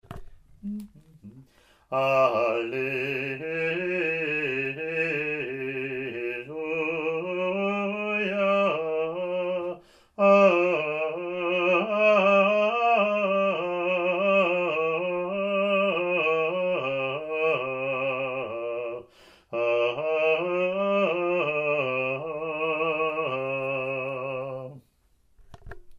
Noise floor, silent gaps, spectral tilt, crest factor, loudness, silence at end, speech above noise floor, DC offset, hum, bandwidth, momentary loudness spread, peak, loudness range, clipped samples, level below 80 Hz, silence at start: -64 dBFS; none; -6.5 dB/octave; 18 dB; -25 LUFS; 0 s; 37 dB; under 0.1%; none; 7.6 kHz; 10 LU; -8 dBFS; 6 LU; under 0.1%; -60 dBFS; 0.1 s